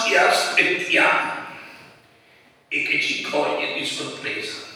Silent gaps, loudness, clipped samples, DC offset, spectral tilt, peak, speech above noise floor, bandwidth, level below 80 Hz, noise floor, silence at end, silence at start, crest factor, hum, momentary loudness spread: none; -20 LUFS; under 0.1%; under 0.1%; -2 dB/octave; -2 dBFS; 33 dB; over 20 kHz; -76 dBFS; -54 dBFS; 0 s; 0 s; 20 dB; none; 12 LU